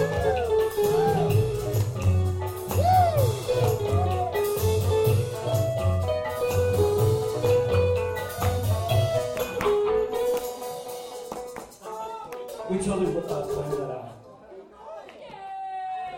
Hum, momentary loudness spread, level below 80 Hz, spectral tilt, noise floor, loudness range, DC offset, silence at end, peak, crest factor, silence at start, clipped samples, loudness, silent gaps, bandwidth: none; 14 LU; -44 dBFS; -6 dB/octave; -46 dBFS; 8 LU; under 0.1%; 0 s; -10 dBFS; 14 dB; 0 s; under 0.1%; -25 LUFS; none; 16.5 kHz